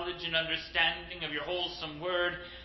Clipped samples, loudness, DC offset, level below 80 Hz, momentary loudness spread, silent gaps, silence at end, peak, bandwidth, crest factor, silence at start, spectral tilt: under 0.1%; -32 LUFS; under 0.1%; -56 dBFS; 8 LU; none; 0 s; -14 dBFS; 6 kHz; 20 dB; 0 s; -4.5 dB/octave